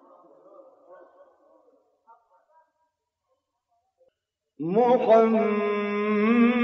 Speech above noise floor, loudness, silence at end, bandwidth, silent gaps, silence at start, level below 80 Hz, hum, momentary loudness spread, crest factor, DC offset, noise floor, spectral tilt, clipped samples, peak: 59 dB; -22 LUFS; 0 s; 6.2 kHz; none; 4.6 s; -74 dBFS; none; 8 LU; 20 dB; under 0.1%; -79 dBFS; -5.5 dB/octave; under 0.1%; -6 dBFS